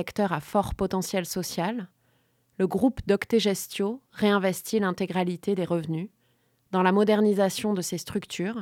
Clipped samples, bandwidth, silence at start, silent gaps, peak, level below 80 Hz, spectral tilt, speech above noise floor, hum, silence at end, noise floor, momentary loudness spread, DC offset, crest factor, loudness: under 0.1%; 17 kHz; 0 s; none; -8 dBFS; -52 dBFS; -5.5 dB/octave; 42 dB; none; 0 s; -68 dBFS; 9 LU; under 0.1%; 18 dB; -26 LUFS